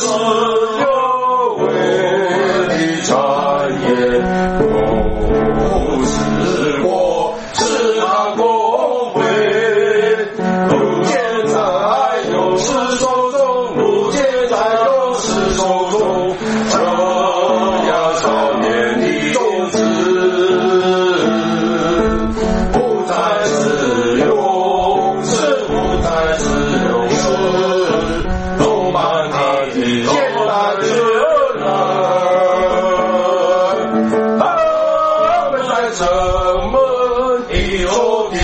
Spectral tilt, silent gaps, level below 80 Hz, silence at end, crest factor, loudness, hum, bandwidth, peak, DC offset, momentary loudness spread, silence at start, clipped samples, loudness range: -4.5 dB/octave; none; -30 dBFS; 0 s; 14 dB; -14 LUFS; none; 8.8 kHz; 0 dBFS; under 0.1%; 3 LU; 0 s; under 0.1%; 1 LU